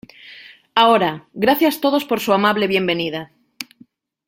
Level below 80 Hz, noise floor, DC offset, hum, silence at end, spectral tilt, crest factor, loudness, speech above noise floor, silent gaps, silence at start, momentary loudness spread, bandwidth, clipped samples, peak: -60 dBFS; -52 dBFS; under 0.1%; none; 0.65 s; -4.5 dB/octave; 18 dB; -17 LUFS; 35 dB; none; 0.25 s; 20 LU; 16.5 kHz; under 0.1%; 0 dBFS